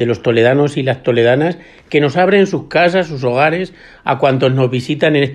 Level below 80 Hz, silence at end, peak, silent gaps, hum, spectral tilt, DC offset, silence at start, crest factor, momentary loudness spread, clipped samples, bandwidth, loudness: -50 dBFS; 0 s; 0 dBFS; none; none; -7 dB/octave; under 0.1%; 0 s; 14 dB; 8 LU; under 0.1%; 10.5 kHz; -14 LUFS